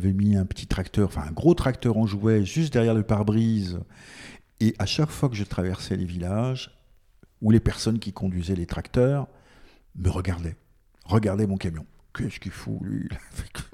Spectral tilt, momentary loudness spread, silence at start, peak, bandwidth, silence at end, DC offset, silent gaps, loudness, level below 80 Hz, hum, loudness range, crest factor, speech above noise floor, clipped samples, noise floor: -7 dB/octave; 15 LU; 0 s; -6 dBFS; 14 kHz; 0.05 s; under 0.1%; none; -25 LUFS; -42 dBFS; none; 6 LU; 18 dB; 32 dB; under 0.1%; -57 dBFS